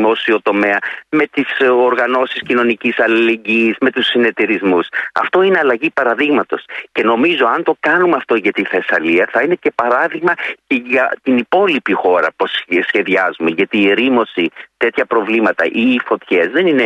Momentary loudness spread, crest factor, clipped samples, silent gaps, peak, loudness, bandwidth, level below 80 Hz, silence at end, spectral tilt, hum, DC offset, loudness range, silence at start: 5 LU; 12 dB; under 0.1%; none; -2 dBFS; -14 LUFS; 8.2 kHz; -62 dBFS; 0 s; -6 dB/octave; none; under 0.1%; 1 LU; 0 s